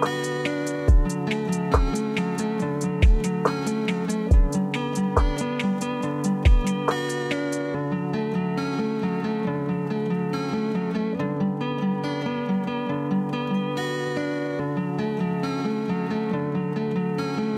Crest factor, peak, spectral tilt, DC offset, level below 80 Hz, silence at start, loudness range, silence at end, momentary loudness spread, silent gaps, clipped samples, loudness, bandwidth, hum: 18 dB; -6 dBFS; -6.5 dB/octave; under 0.1%; -28 dBFS; 0 s; 3 LU; 0 s; 5 LU; none; under 0.1%; -25 LUFS; 13.5 kHz; none